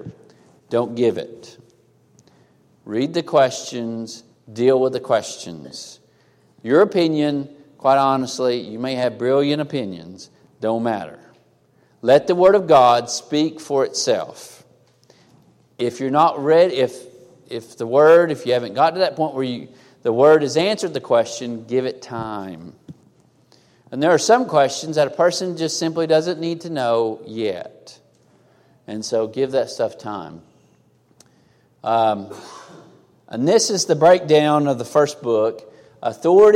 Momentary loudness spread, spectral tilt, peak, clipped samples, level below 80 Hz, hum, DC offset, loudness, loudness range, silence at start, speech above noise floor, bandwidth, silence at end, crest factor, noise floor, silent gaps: 19 LU; -4.5 dB/octave; -2 dBFS; under 0.1%; -66 dBFS; none; under 0.1%; -18 LUFS; 8 LU; 0.05 s; 39 dB; 14.5 kHz; 0 s; 16 dB; -58 dBFS; none